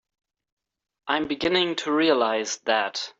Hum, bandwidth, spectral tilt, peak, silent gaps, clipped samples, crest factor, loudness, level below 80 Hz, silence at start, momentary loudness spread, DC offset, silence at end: none; 8 kHz; -3 dB/octave; -8 dBFS; none; under 0.1%; 18 dB; -23 LUFS; -62 dBFS; 1.05 s; 6 LU; under 0.1%; 0.1 s